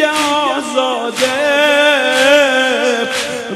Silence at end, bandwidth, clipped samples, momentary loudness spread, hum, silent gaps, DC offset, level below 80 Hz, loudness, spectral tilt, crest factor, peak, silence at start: 0 s; 13.5 kHz; under 0.1%; 7 LU; none; none; under 0.1%; -58 dBFS; -12 LUFS; -1.5 dB/octave; 14 dB; 0 dBFS; 0 s